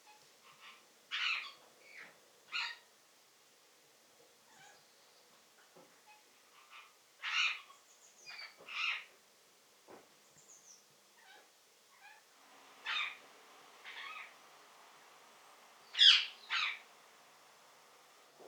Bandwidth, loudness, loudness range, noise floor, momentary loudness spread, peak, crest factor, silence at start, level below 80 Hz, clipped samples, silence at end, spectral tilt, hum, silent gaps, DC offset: over 20 kHz; -33 LUFS; 16 LU; -67 dBFS; 28 LU; -10 dBFS; 32 dB; 0.65 s; under -90 dBFS; under 0.1%; 0 s; 3 dB/octave; none; none; under 0.1%